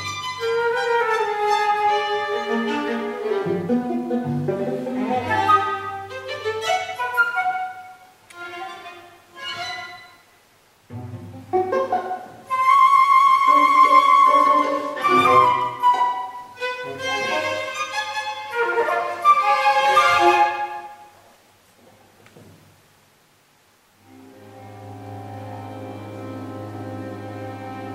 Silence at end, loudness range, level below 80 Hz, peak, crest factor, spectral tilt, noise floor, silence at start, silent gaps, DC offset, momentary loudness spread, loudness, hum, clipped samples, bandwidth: 0 s; 19 LU; -66 dBFS; -4 dBFS; 18 dB; -4.5 dB/octave; -58 dBFS; 0 s; none; under 0.1%; 21 LU; -19 LUFS; none; under 0.1%; 15 kHz